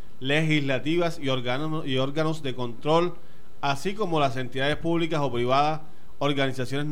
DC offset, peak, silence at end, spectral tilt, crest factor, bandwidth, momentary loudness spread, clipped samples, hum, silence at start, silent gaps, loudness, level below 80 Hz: 4%; -8 dBFS; 0 s; -6 dB/octave; 18 dB; 16 kHz; 7 LU; under 0.1%; none; 0.2 s; none; -26 LUFS; -52 dBFS